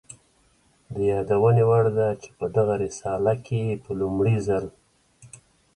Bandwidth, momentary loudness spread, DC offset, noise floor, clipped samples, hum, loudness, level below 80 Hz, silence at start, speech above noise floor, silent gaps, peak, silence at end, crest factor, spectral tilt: 11 kHz; 9 LU; under 0.1%; -62 dBFS; under 0.1%; none; -23 LUFS; -52 dBFS; 0.9 s; 40 dB; none; -8 dBFS; 0.5 s; 16 dB; -8 dB/octave